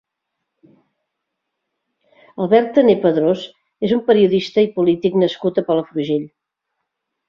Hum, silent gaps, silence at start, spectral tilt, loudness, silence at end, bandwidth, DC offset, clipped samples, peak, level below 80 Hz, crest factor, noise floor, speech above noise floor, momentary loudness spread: none; none; 2.4 s; -7.5 dB/octave; -17 LUFS; 1 s; 7.2 kHz; under 0.1%; under 0.1%; -2 dBFS; -60 dBFS; 18 dB; -78 dBFS; 62 dB; 11 LU